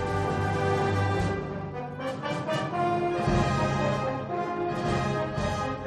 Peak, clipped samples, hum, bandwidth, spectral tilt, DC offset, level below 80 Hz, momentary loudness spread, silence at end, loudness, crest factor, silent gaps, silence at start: -12 dBFS; under 0.1%; none; 12 kHz; -6.5 dB/octave; under 0.1%; -44 dBFS; 7 LU; 0 s; -28 LUFS; 16 dB; none; 0 s